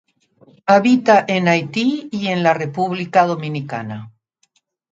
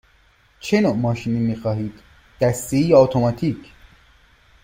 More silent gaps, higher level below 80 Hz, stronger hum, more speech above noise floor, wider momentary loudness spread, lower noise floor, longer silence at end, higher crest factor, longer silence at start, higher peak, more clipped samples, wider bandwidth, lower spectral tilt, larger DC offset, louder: neither; second, -66 dBFS vs -48 dBFS; neither; first, 48 dB vs 38 dB; about the same, 14 LU vs 13 LU; first, -64 dBFS vs -56 dBFS; second, 0.85 s vs 1 s; about the same, 18 dB vs 20 dB; about the same, 0.65 s vs 0.65 s; about the same, 0 dBFS vs -2 dBFS; neither; second, 7.8 kHz vs 16.5 kHz; about the same, -6 dB/octave vs -7 dB/octave; neither; about the same, -17 LUFS vs -19 LUFS